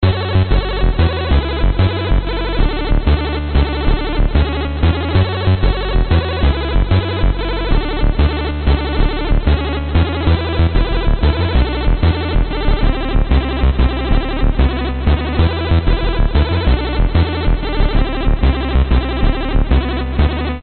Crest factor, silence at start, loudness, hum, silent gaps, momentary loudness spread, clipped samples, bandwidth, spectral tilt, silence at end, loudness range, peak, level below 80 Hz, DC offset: 12 dB; 0 s; -16 LUFS; none; none; 3 LU; under 0.1%; 4.5 kHz; -5.5 dB/octave; 0 s; 1 LU; 0 dBFS; -16 dBFS; under 0.1%